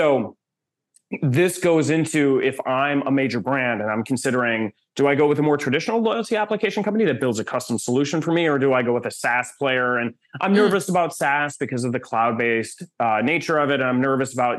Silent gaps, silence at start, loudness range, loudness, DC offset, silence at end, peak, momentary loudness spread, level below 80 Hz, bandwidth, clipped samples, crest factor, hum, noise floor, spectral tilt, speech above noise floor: none; 0 s; 1 LU; -21 LUFS; under 0.1%; 0 s; -6 dBFS; 7 LU; -70 dBFS; 12.5 kHz; under 0.1%; 16 dB; none; -84 dBFS; -5.5 dB/octave; 63 dB